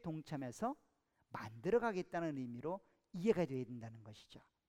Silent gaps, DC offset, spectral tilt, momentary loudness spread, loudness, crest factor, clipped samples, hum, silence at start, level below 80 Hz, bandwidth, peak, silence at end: none; under 0.1%; -7 dB/octave; 18 LU; -41 LUFS; 22 dB; under 0.1%; none; 0.05 s; -74 dBFS; 14 kHz; -20 dBFS; 0.3 s